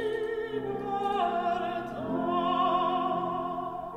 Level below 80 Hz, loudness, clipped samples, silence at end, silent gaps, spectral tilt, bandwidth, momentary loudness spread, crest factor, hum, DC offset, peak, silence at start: -60 dBFS; -30 LUFS; under 0.1%; 0 s; none; -6.5 dB/octave; 12 kHz; 7 LU; 14 dB; none; under 0.1%; -16 dBFS; 0 s